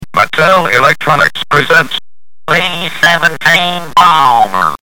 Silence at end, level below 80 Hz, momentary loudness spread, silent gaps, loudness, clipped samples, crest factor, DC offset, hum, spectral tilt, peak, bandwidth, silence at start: 0 s; -44 dBFS; 5 LU; none; -9 LUFS; 0.5%; 10 dB; 5%; none; -3.5 dB/octave; 0 dBFS; over 20 kHz; 0 s